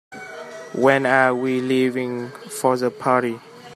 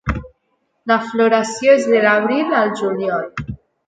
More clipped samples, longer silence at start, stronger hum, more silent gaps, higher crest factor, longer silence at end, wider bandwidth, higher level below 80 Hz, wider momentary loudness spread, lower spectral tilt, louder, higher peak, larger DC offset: neither; about the same, 0.1 s vs 0.05 s; neither; neither; about the same, 20 dB vs 18 dB; second, 0 s vs 0.35 s; first, 14 kHz vs 9.2 kHz; second, -68 dBFS vs -38 dBFS; first, 18 LU vs 15 LU; about the same, -5.5 dB/octave vs -5 dB/octave; second, -20 LUFS vs -16 LUFS; about the same, 0 dBFS vs 0 dBFS; neither